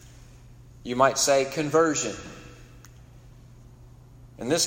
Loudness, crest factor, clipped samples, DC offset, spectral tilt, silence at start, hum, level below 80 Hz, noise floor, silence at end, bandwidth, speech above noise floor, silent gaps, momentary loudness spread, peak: -24 LUFS; 24 dB; under 0.1%; under 0.1%; -3 dB/octave; 0.05 s; none; -54 dBFS; -49 dBFS; 0 s; 16 kHz; 26 dB; none; 21 LU; -4 dBFS